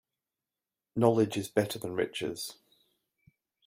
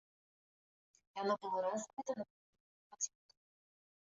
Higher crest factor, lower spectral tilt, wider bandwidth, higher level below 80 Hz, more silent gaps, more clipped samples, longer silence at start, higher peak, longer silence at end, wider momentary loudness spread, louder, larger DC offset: about the same, 24 dB vs 20 dB; first, -5.5 dB/octave vs -3.5 dB/octave; first, 16 kHz vs 8 kHz; first, -70 dBFS vs -90 dBFS; second, none vs 1.93-1.97 s, 2.30-2.53 s, 2.60-2.90 s; neither; second, 0.95 s vs 1.15 s; first, -10 dBFS vs -24 dBFS; about the same, 1.15 s vs 1.1 s; first, 14 LU vs 9 LU; first, -31 LUFS vs -41 LUFS; neither